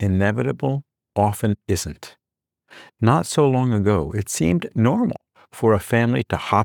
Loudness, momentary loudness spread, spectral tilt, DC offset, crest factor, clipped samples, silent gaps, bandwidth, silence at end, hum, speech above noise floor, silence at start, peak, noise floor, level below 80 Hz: -21 LUFS; 7 LU; -6.5 dB/octave; under 0.1%; 18 dB; under 0.1%; none; 19.5 kHz; 0 s; none; 66 dB; 0 s; -4 dBFS; -86 dBFS; -50 dBFS